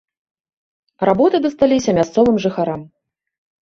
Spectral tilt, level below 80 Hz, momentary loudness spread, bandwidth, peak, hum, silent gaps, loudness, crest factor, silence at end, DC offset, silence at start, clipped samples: -6 dB/octave; -50 dBFS; 8 LU; 7.6 kHz; -2 dBFS; none; none; -16 LUFS; 16 dB; 0.75 s; under 0.1%; 1 s; under 0.1%